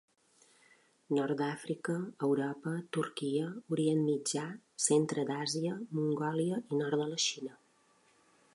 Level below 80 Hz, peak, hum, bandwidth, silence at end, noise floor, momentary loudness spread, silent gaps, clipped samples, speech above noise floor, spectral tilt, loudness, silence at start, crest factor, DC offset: -84 dBFS; -14 dBFS; none; 11.5 kHz; 1 s; -69 dBFS; 7 LU; none; under 0.1%; 35 dB; -4.5 dB/octave; -34 LUFS; 1.1 s; 20 dB; under 0.1%